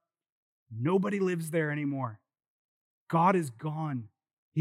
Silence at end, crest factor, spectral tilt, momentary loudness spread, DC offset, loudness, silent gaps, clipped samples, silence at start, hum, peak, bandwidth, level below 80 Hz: 0 s; 20 dB; -7.5 dB/octave; 11 LU; under 0.1%; -31 LUFS; 2.47-3.07 s, 4.33-4.52 s; under 0.1%; 0.7 s; none; -12 dBFS; 14.5 kHz; under -90 dBFS